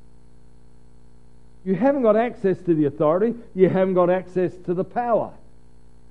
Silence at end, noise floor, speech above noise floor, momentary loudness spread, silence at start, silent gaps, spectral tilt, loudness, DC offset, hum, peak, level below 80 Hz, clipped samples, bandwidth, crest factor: 0.8 s; -52 dBFS; 32 dB; 7 LU; 1.65 s; none; -9.5 dB/octave; -21 LUFS; 0.8%; 60 Hz at -45 dBFS; -4 dBFS; -54 dBFS; under 0.1%; 5.6 kHz; 18 dB